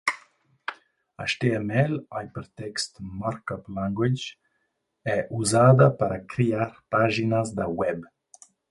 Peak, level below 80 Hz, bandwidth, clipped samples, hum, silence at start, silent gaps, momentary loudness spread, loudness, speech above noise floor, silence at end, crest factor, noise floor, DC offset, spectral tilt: -4 dBFS; -56 dBFS; 11.5 kHz; under 0.1%; none; 0.05 s; none; 18 LU; -25 LUFS; 51 dB; 0.65 s; 22 dB; -76 dBFS; under 0.1%; -6 dB/octave